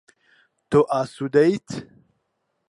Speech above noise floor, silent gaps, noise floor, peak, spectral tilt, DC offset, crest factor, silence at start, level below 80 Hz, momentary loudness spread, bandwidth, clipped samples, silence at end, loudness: 54 dB; none; -74 dBFS; -6 dBFS; -7 dB/octave; under 0.1%; 18 dB; 0.7 s; -62 dBFS; 15 LU; 11 kHz; under 0.1%; 0.85 s; -21 LUFS